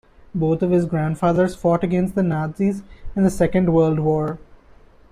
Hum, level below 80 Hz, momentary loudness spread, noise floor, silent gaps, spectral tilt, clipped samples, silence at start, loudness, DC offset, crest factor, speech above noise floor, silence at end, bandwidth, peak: none; -42 dBFS; 10 LU; -48 dBFS; none; -8.5 dB/octave; under 0.1%; 0.35 s; -20 LUFS; under 0.1%; 14 dB; 29 dB; 0.55 s; 13 kHz; -6 dBFS